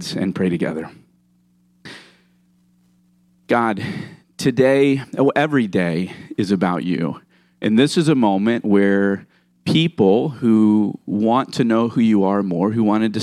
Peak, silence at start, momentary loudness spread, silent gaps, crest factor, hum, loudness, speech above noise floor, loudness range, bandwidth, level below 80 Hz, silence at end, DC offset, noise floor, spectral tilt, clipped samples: -4 dBFS; 0 s; 12 LU; none; 16 dB; 60 Hz at -50 dBFS; -18 LUFS; 42 dB; 10 LU; 12.5 kHz; -62 dBFS; 0 s; under 0.1%; -59 dBFS; -6.5 dB/octave; under 0.1%